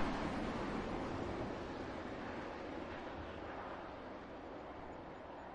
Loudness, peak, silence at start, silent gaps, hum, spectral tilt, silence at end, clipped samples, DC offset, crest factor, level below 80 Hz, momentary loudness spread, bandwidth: -45 LUFS; -24 dBFS; 0 s; none; none; -6.5 dB/octave; 0 s; under 0.1%; under 0.1%; 20 dB; -56 dBFS; 9 LU; 11 kHz